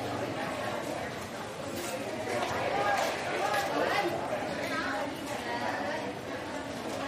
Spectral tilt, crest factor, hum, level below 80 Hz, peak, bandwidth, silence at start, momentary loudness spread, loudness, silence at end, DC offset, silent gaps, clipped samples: -4 dB/octave; 16 dB; none; -62 dBFS; -16 dBFS; 15 kHz; 0 s; 8 LU; -33 LUFS; 0 s; under 0.1%; none; under 0.1%